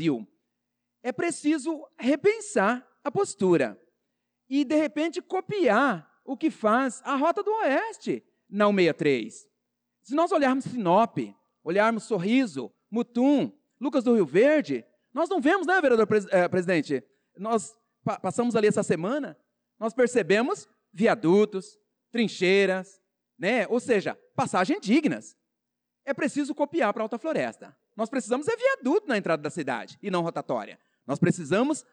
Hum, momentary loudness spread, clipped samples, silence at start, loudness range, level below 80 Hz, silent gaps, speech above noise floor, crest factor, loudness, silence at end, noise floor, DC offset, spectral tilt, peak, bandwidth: none; 12 LU; under 0.1%; 0 s; 4 LU; -74 dBFS; none; 59 dB; 14 dB; -26 LUFS; 0.1 s; -84 dBFS; under 0.1%; -5.5 dB/octave; -12 dBFS; 10.5 kHz